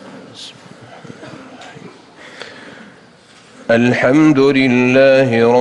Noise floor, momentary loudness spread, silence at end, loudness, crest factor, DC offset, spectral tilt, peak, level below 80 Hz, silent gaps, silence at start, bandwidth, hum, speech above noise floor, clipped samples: -44 dBFS; 25 LU; 0 s; -11 LUFS; 14 dB; under 0.1%; -6.5 dB/octave; -2 dBFS; -54 dBFS; none; 0.05 s; 10.5 kHz; none; 33 dB; under 0.1%